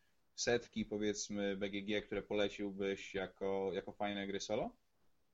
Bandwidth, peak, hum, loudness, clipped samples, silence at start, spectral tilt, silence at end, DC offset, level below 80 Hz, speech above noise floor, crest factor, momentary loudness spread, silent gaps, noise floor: 8.2 kHz; -22 dBFS; none; -40 LUFS; under 0.1%; 0.35 s; -4 dB/octave; 0.6 s; under 0.1%; -66 dBFS; 39 dB; 20 dB; 5 LU; none; -79 dBFS